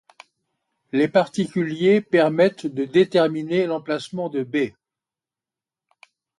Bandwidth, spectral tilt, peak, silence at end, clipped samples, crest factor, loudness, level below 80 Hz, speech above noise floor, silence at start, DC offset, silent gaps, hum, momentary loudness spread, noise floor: 11.5 kHz; -6.5 dB/octave; -4 dBFS; 1.7 s; under 0.1%; 18 dB; -21 LUFS; -68 dBFS; 70 dB; 0.95 s; under 0.1%; none; none; 10 LU; -90 dBFS